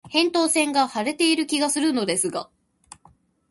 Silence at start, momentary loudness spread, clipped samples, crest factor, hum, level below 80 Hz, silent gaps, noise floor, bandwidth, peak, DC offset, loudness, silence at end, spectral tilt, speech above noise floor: 0.05 s; 5 LU; under 0.1%; 16 dB; none; -66 dBFS; none; -58 dBFS; 12 kHz; -6 dBFS; under 0.1%; -21 LUFS; 1.05 s; -2 dB/octave; 36 dB